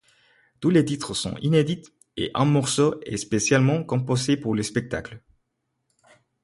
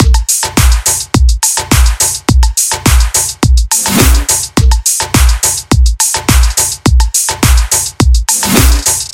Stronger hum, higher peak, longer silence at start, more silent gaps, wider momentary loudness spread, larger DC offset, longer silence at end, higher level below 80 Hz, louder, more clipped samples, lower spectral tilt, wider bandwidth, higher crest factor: neither; second, -6 dBFS vs 0 dBFS; first, 0.6 s vs 0 s; neither; first, 11 LU vs 3 LU; neither; first, 1.25 s vs 0.05 s; second, -54 dBFS vs -12 dBFS; second, -23 LUFS vs -9 LUFS; second, under 0.1% vs 0.4%; first, -5.5 dB/octave vs -3 dB/octave; second, 11.5 kHz vs 17.5 kHz; first, 18 dB vs 8 dB